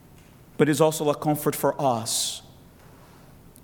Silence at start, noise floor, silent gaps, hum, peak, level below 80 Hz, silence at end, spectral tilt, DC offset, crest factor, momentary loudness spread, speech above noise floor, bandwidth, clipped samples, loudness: 0.6 s; -50 dBFS; none; none; -4 dBFS; -58 dBFS; 1.15 s; -4.5 dB/octave; under 0.1%; 22 dB; 5 LU; 27 dB; 19 kHz; under 0.1%; -24 LUFS